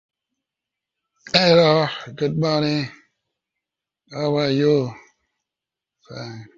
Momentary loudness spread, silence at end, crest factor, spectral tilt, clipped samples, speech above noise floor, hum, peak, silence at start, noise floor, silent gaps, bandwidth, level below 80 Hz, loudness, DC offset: 20 LU; 0.1 s; 20 dB; -6 dB/octave; under 0.1%; 68 dB; none; -2 dBFS; 1.25 s; -87 dBFS; none; 7.6 kHz; -60 dBFS; -19 LUFS; under 0.1%